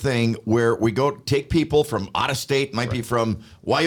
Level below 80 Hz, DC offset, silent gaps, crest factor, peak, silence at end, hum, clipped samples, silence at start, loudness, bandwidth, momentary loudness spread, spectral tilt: -46 dBFS; under 0.1%; none; 14 dB; -8 dBFS; 0 s; none; under 0.1%; 0 s; -22 LUFS; 19 kHz; 4 LU; -5.5 dB/octave